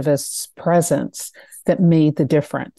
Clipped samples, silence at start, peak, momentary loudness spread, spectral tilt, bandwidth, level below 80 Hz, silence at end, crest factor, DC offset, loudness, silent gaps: under 0.1%; 0 s; -4 dBFS; 13 LU; -6 dB/octave; 12.5 kHz; -60 dBFS; 0.15 s; 14 dB; under 0.1%; -18 LUFS; none